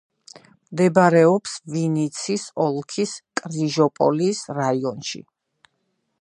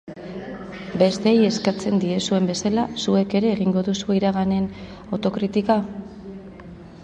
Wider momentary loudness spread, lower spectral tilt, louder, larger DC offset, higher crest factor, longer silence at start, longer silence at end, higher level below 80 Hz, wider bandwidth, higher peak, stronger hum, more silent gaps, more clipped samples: second, 13 LU vs 19 LU; about the same, -5.5 dB/octave vs -6 dB/octave; about the same, -21 LUFS vs -21 LUFS; neither; about the same, 20 dB vs 18 dB; first, 0.7 s vs 0.05 s; first, 1 s vs 0 s; second, -70 dBFS vs -52 dBFS; first, 11 kHz vs 9 kHz; about the same, -2 dBFS vs -4 dBFS; neither; neither; neither